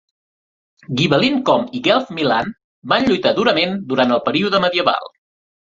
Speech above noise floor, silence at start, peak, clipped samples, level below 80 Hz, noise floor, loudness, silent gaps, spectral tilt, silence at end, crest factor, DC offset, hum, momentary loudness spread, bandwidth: over 73 dB; 0.9 s; 0 dBFS; under 0.1%; -54 dBFS; under -90 dBFS; -17 LUFS; 2.64-2.82 s; -5.5 dB/octave; 0.65 s; 18 dB; under 0.1%; none; 5 LU; 7.6 kHz